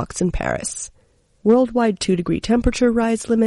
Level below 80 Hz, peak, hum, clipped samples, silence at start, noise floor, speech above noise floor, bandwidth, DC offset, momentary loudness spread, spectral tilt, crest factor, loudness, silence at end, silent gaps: -34 dBFS; -4 dBFS; none; under 0.1%; 0 s; -58 dBFS; 39 dB; 11.5 kHz; under 0.1%; 9 LU; -5.5 dB/octave; 14 dB; -19 LUFS; 0 s; none